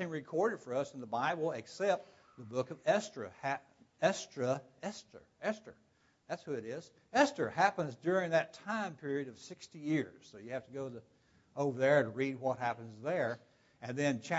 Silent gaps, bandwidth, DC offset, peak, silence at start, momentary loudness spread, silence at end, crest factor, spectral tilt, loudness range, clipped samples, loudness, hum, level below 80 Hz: none; 7.6 kHz; under 0.1%; -16 dBFS; 0 s; 15 LU; 0 s; 22 dB; -4.5 dB/octave; 5 LU; under 0.1%; -36 LUFS; none; -80 dBFS